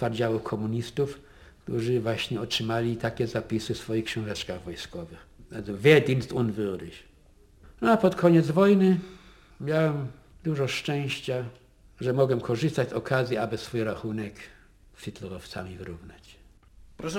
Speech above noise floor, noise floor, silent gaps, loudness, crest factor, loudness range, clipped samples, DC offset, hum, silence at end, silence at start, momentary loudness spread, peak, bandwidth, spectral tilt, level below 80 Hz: 30 dB; -56 dBFS; none; -27 LUFS; 24 dB; 8 LU; under 0.1%; under 0.1%; none; 0 s; 0 s; 19 LU; -4 dBFS; 16.5 kHz; -6.5 dB/octave; -54 dBFS